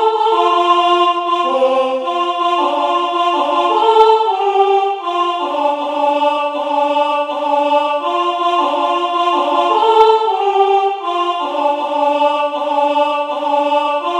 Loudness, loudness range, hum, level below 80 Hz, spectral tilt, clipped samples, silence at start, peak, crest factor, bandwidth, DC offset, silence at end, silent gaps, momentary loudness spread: -14 LUFS; 2 LU; none; -66 dBFS; -2 dB/octave; under 0.1%; 0 s; 0 dBFS; 14 dB; 10.5 kHz; under 0.1%; 0 s; none; 6 LU